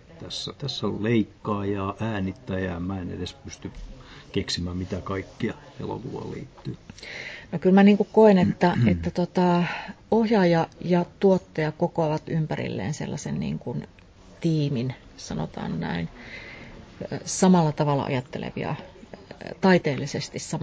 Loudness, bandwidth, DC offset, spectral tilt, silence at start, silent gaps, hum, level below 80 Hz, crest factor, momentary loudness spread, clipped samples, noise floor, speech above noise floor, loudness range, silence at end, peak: -25 LUFS; 8 kHz; under 0.1%; -6.5 dB/octave; 0.1 s; none; none; -48 dBFS; 20 dB; 19 LU; under 0.1%; -43 dBFS; 19 dB; 11 LU; 0 s; -6 dBFS